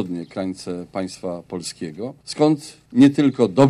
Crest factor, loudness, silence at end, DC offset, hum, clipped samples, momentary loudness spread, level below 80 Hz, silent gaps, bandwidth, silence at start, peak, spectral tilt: 16 dB; -21 LUFS; 0 s; under 0.1%; none; under 0.1%; 15 LU; -60 dBFS; none; 11.5 kHz; 0 s; -4 dBFS; -6.5 dB/octave